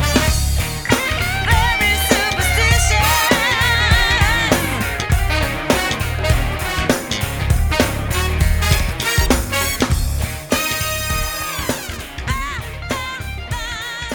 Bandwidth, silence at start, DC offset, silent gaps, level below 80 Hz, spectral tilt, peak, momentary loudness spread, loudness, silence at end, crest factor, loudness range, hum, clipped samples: over 20 kHz; 0 s; under 0.1%; none; -22 dBFS; -3.5 dB/octave; 0 dBFS; 10 LU; -17 LUFS; 0 s; 16 dB; 7 LU; none; under 0.1%